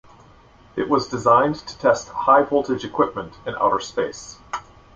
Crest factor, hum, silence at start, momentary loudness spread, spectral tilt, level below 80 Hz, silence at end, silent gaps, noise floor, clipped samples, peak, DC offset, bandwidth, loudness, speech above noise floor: 18 dB; none; 0.75 s; 16 LU; -5 dB/octave; -52 dBFS; 0.35 s; none; -50 dBFS; under 0.1%; -2 dBFS; under 0.1%; 7.8 kHz; -20 LUFS; 30 dB